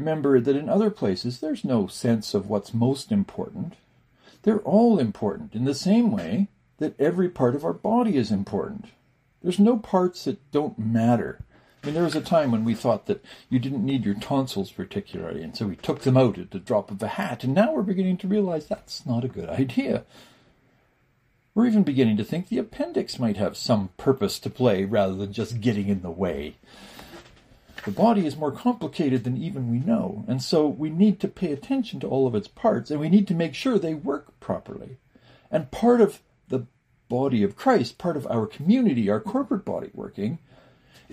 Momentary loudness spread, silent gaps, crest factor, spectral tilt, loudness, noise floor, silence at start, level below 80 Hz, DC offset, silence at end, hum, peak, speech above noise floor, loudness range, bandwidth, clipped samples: 11 LU; none; 18 dB; -7 dB/octave; -25 LUFS; -66 dBFS; 0 s; -58 dBFS; under 0.1%; 0.75 s; none; -6 dBFS; 42 dB; 3 LU; 15 kHz; under 0.1%